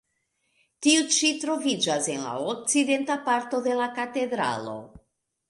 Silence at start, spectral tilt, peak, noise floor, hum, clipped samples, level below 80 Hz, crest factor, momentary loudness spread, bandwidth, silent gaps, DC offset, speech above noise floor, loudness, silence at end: 0.8 s; -2 dB/octave; -8 dBFS; -75 dBFS; none; under 0.1%; -68 dBFS; 20 dB; 8 LU; 11.5 kHz; none; under 0.1%; 49 dB; -25 LUFS; 0.5 s